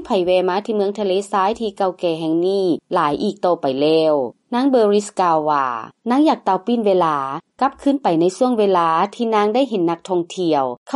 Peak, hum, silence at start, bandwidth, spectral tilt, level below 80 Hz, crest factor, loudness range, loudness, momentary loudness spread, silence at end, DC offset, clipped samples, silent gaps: -4 dBFS; none; 0 s; 11.5 kHz; -6 dB/octave; -60 dBFS; 12 dB; 2 LU; -18 LUFS; 6 LU; 0 s; under 0.1%; under 0.1%; 10.77-10.86 s